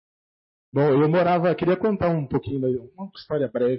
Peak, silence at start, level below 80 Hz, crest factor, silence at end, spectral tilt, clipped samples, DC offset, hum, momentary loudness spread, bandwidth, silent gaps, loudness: -8 dBFS; 0.75 s; -54 dBFS; 14 dB; 0 s; -12 dB/octave; under 0.1%; under 0.1%; none; 11 LU; 5.8 kHz; none; -22 LUFS